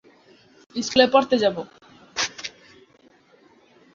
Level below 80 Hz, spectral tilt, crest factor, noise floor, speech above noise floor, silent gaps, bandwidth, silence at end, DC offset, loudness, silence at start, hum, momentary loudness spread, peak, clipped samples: -62 dBFS; -3 dB/octave; 24 dB; -56 dBFS; 37 dB; none; 7.6 kHz; 1.45 s; under 0.1%; -21 LUFS; 0.75 s; none; 19 LU; -2 dBFS; under 0.1%